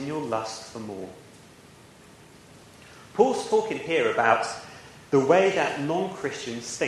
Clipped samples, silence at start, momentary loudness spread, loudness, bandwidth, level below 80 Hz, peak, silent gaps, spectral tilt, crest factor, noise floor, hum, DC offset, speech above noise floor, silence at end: under 0.1%; 0 s; 17 LU; -25 LUFS; 12.5 kHz; -66 dBFS; -6 dBFS; none; -4.5 dB/octave; 22 dB; -51 dBFS; none; under 0.1%; 26 dB; 0 s